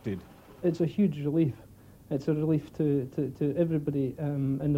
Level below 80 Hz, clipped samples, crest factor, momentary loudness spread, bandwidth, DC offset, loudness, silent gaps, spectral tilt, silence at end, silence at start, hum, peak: -58 dBFS; under 0.1%; 14 dB; 7 LU; 15.5 kHz; under 0.1%; -29 LUFS; none; -9.5 dB/octave; 0 s; 0.05 s; none; -14 dBFS